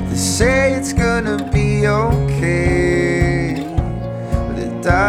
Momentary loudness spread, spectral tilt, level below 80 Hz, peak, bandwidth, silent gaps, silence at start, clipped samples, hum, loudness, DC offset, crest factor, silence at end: 7 LU; -5.5 dB/octave; -26 dBFS; 0 dBFS; 15.5 kHz; none; 0 s; under 0.1%; none; -17 LUFS; under 0.1%; 16 dB; 0 s